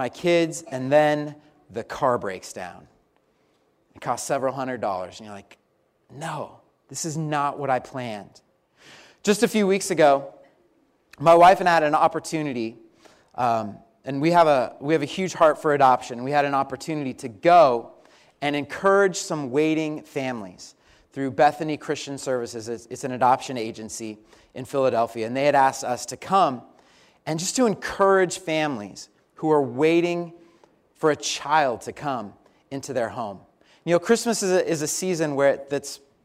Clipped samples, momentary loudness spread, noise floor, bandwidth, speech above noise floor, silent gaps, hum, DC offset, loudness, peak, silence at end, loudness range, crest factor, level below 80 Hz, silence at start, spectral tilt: under 0.1%; 17 LU; -66 dBFS; 16 kHz; 43 dB; none; none; under 0.1%; -23 LUFS; -6 dBFS; 0.3 s; 9 LU; 18 dB; -64 dBFS; 0 s; -4.5 dB/octave